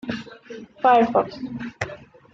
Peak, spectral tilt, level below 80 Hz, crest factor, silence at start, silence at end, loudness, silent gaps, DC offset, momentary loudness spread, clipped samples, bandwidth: -4 dBFS; -6 dB/octave; -58 dBFS; 20 dB; 0.05 s; 0.3 s; -22 LUFS; none; under 0.1%; 23 LU; under 0.1%; 7.6 kHz